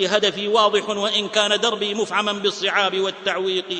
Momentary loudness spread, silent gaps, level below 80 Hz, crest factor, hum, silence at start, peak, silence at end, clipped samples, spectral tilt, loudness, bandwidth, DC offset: 5 LU; none; -64 dBFS; 18 dB; none; 0 s; -2 dBFS; 0 s; under 0.1%; -2.5 dB/octave; -20 LUFS; 9.6 kHz; under 0.1%